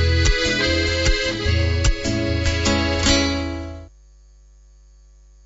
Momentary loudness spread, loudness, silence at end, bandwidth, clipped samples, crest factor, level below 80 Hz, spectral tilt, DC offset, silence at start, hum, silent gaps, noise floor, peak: 9 LU; -19 LUFS; 1.55 s; 8 kHz; under 0.1%; 16 dB; -26 dBFS; -4 dB/octave; under 0.1%; 0 s; 50 Hz at -45 dBFS; none; -48 dBFS; -4 dBFS